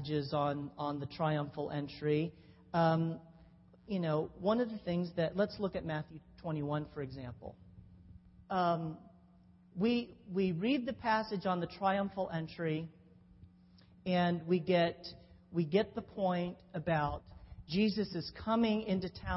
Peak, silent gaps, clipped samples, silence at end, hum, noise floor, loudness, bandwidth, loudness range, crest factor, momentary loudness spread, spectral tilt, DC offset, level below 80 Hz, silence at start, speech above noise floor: -18 dBFS; none; under 0.1%; 0 s; none; -62 dBFS; -35 LUFS; 5.8 kHz; 5 LU; 18 dB; 13 LU; -5.5 dB/octave; under 0.1%; -62 dBFS; 0 s; 28 dB